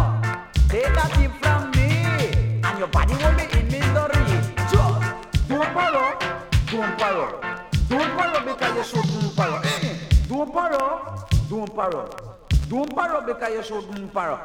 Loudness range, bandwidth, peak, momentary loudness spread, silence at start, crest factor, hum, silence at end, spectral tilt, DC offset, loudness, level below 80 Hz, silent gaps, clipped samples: 4 LU; 16 kHz; -4 dBFS; 7 LU; 0 s; 18 dB; none; 0 s; -6 dB/octave; under 0.1%; -22 LUFS; -26 dBFS; none; under 0.1%